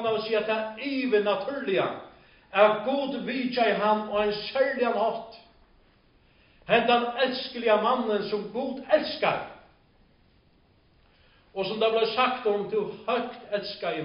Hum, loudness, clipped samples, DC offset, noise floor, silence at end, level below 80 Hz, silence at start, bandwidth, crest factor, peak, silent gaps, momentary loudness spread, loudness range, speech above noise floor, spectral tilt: none; -26 LUFS; under 0.1%; under 0.1%; -62 dBFS; 0 s; -64 dBFS; 0 s; 5.4 kHz; 20 dB; -6 dBFS; none; 10 LU; 5 LU; 36 dB; -2 dB/octave